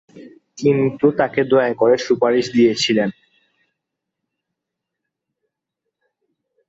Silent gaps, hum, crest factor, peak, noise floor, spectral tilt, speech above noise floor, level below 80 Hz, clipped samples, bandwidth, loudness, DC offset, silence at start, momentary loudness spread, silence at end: none; none; 18 dB; -2 dBFS; -81 dBFS; -5.5 dB/octave; 65 dB; -62 dBFS; under 0.1%; 8 kHz; -17 LUFS; under 0.1%; 0.15 s; 4 LU; 3.55 s